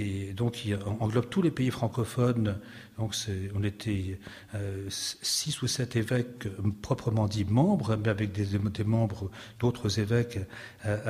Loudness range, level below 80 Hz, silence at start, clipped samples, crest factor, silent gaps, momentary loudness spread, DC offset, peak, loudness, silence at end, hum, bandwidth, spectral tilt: 4 LU; -56 dBFS; 0 s; under 0.1%; 18 dB; none; 10 LU; under 0.1%; -12 dBFS; -30 LUFS; 0 s; none; 15.5 kHz; -5.5 dB/octave